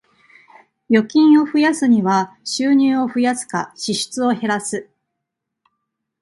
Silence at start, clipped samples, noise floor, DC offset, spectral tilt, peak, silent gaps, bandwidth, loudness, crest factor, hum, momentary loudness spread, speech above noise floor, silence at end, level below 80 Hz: 0.9 s; under 0.1%; -79 dBFS; under 0.1%; -4.5 dB/octave; -2 dBFS; none; 11.5 kHz; -17 LUFS; 16 dB; none; 11 LU; 63 dB; 1.4 s; -68 dBFS